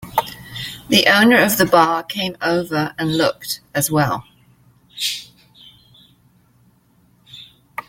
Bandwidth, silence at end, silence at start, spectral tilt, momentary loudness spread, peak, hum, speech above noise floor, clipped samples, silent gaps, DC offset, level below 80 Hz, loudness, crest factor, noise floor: 17 kHz; 0.05 s; 0 s; -3.5 dB/octave; 18 LU; 0 dBFS; 60 Hz at -50 dBFS; 40 dB; under 0.1%; none; under 0.1%; -54 dBFS; -17 LUFS; 20 dB; -56 dBFS